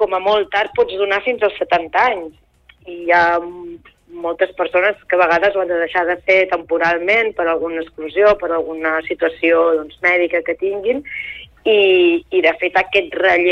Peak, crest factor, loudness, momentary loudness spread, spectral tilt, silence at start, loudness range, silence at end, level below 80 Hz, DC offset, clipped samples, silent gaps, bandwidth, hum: -2 dBFS; 14 dB; -16 LUFS; 11 LU; -5 dB/octave; 0 s; 3 LU; 0 s; -52 dBFS; under 0.1%; under 0.1%; none; 6.8 kHz; none